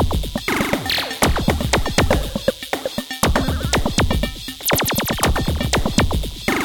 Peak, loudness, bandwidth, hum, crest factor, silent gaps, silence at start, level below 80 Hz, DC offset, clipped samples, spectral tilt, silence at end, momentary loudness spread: 0 dBFS; -20 LUFS; 19 kHz; none; 18 dB; none; 0 s; -26 dBFS; under 0.1%; under 0.1%; -4 dB/octave; 0 s; 5 LU